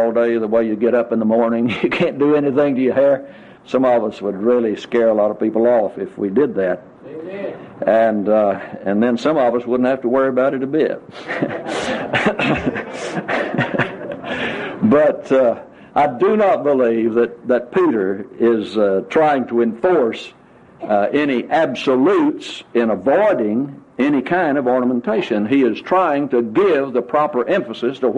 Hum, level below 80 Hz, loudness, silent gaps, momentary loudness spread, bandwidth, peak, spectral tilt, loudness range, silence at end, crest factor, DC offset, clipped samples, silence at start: none; -54 dBFS; -17 LUFS; none; 8 LU; 10 kHz; -2 dBFS; -7 dB/octave; 3 LU; 0 s; 14 dB; under 0.1%; under 0.1%; 0 s